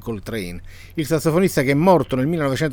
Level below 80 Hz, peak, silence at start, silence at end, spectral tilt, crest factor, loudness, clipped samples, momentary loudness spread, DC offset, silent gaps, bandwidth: -42 dBFS; -2 dBFS; 0 s; 0 s; -6.5 dB/octave; 16 dB; -19 LUFS; under 0.1%; 15 LU; under 0.1%; none; over 20 kHz